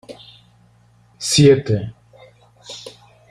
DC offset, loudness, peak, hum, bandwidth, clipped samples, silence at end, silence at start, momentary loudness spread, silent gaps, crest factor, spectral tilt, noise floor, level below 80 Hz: under 0.1%; -15 LUFS; -2 dBFS; 60 Hz at -50 dBFS; 15 kHz; under 0.1%; 0.4 s; 0.1 s; 27 LU; none; 18 dB; -5 dB/octave; -53 dBFS; -50 dBFS